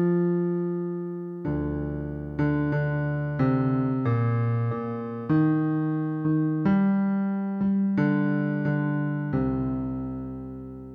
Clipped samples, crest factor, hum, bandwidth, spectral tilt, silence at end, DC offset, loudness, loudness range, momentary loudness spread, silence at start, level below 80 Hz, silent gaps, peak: under 0.1%; 14 dB; none; 5 kHz; -11.5 dB/octave; 0 s; under 0.1%; -26 LUFS; 3 LU; 9 LU; 0 s; -48 dBFS; none; -12 dBFS